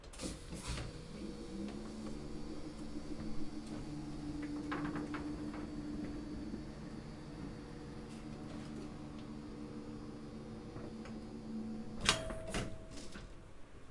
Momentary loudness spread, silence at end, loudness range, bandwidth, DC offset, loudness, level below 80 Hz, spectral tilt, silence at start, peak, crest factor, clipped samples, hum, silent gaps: 8 LU; 0 s; 7 LU; 11.5 kHz; under 0.1%; -44 LUFS; -54 dBFS; -4 dB/octave; 0 s; -12 dBFS; 32 dB; under 0.1%; none; none